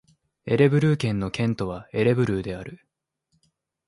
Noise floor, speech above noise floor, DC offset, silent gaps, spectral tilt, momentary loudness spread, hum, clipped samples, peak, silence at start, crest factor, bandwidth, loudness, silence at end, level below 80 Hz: -74 dBFS; 52 dB; under 0.1%; none; -7.5 dB/octave; 16 LU; none; under 0.1%; -6 dBFS; 0.45 s; 20 dB; 11.5 kHz; -23 LUFS; 1.15 s; -50 dBFS